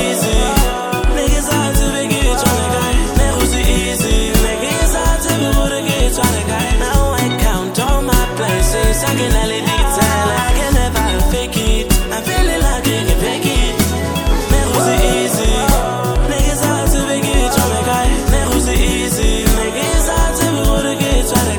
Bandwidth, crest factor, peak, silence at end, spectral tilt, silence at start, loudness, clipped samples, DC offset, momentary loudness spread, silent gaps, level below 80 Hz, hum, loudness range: over 20 kHz; 14 dB; 0 dBFS; 0 s; -4 dB/octave; 0 s; -15 LUFS; under 0.1%; under 0.1%; 3 LU; none; -18 dBFS; none; 1 LU